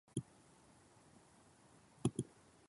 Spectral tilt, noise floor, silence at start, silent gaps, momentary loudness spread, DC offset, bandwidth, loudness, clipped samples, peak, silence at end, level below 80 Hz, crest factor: -6 dB/octave; -67 dBFS; 0.15 s; none; 24 LU; under 0.1%; 11.5 kHz; -45 LUFS; under 0.1%; -20 dBFS; 0.45 s; -72 dBFS; 28 dB